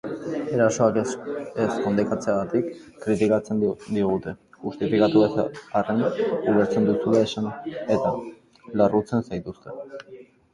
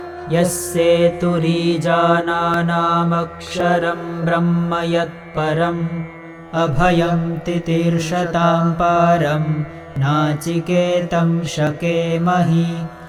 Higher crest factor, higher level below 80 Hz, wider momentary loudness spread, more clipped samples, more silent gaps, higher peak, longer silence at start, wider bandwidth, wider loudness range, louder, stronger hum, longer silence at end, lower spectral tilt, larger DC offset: about the same, 18 dB vs 14 dB; second, -56 dBFS vs -42 dBFS; first, 14 LU vs 7 LU; neither; neither; second, -6 dBFS vs -2 dBFS; about the same, 0.05 s vs 0 s; second, 11 kHz vs 14.5 kHz; about the same, 3 LU vs 3 LU; second, -24 LUFS vs -18 LUFS; neither; first, 0.3 s vs 0 s; about the same, -6.5 dB/octave vs -6 dB/octave; neither